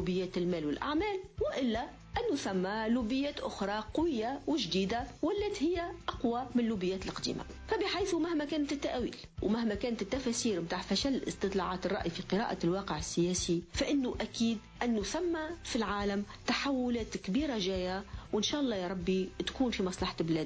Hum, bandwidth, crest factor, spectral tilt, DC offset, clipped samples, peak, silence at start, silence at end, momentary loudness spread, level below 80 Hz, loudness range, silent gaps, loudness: none; 8 kHz; 14 dB; -4.5 dB/octave; under 0.1%; under 0.1%; -20 dBFS; 0 s; 0 s; 5 LU; -52 dBFS; 1 LU; none; -34 LUFS